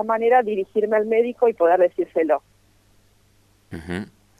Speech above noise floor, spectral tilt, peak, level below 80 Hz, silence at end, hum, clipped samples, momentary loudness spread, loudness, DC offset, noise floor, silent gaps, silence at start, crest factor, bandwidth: 39 dB; -7 dB/octave; -6 dBFS; -58 dBFS; 0.35 s; 50 Hz at -60 dBFS; under 0.1%; 14 LU; -20 LUFS; under 0.1%; -58 dBFS; none; 0 s; 16 dB; 10.5 kHz